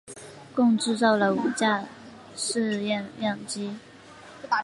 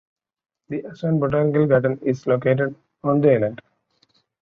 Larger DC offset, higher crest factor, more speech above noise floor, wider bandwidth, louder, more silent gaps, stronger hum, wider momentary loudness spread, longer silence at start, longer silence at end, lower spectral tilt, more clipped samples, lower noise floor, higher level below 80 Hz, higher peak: neither; about the same, 20 dB vs 18 dB; second, 22 dB vs 45 dB; first, 11.5 kHz vs 6.8 kHz; second, -26 LUFS vs -21 LUFS; neither; neither; first, 21 LU vs 11 LU; second, 0.05 s vs 0.7 s; second, 0 s vs 0.85 s; second, -4 dB/octave vs -9.5 dB/octave; neither; second, -47 dBFS vs -64 dBFS; second, -70 dBFS vs -58 dBFS; second, -8 dBFS vs -4 dBFS